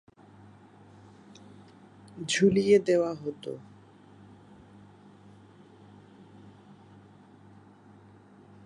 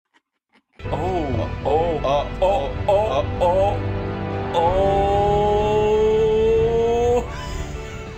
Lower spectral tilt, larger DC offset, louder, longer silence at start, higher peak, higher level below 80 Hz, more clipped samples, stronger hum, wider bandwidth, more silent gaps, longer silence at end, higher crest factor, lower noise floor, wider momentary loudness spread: second, -5 dB/octave vs -7 dB/octave; neither; second, -26 LUFS vs -20 LUFS; first, 2.15 s vs 0.8 s; second, -10 dBFS vs -6 dBFS; second, -68 dBFS vs -32 dBFS; neither; neither; second, 11 kHz vs 15 kHz; neither; first, 5.05 s vs 0 s; first, 22 dB vs 14 dB; second, -54 dBFS vs -65 dBFS; first, 30 LU vs 11 LU